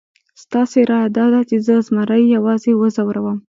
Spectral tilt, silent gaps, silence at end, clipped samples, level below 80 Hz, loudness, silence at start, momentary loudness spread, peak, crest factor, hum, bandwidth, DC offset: -7.5 dB/octave; none; 0.2 s; under 0.1%; -64 dBFS; -15 LUFS; 0.5 s; 6 LU; -2 dBFS; 14 dB; none; 7.6 kHz; under 0.1%